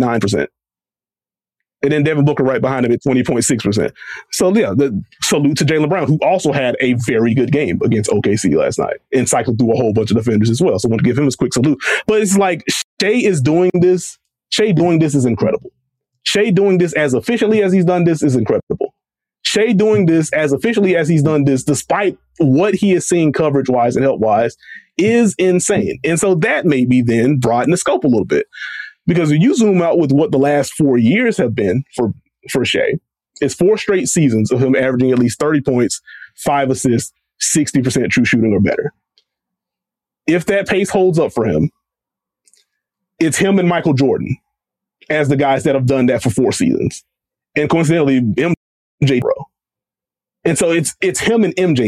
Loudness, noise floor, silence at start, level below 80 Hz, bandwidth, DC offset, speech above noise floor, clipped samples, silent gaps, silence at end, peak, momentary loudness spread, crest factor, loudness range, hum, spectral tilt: -15 LUFS; under -90 dBFS; 0 s; -50 dBFS; 14 kHz; under 0.1%; over 76 dB; under 0.1%; 12.84-12.97 s, 18.63-18.67 s, 48.57-48.98 s; 0 s; -4 dBFS; 7 LU; 12 dB; 3 LU; none; -5.5 dB/octave